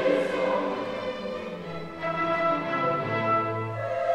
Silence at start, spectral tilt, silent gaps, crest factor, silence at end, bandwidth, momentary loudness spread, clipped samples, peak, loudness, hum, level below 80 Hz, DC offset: 0 s; -6.5 dB/octave; none; 16 dB; 0 s; 11 kHz; 10 LU; under 0.1%; -12 dBFS; -28 LUFS; none; -62 dBFS; under 0.1%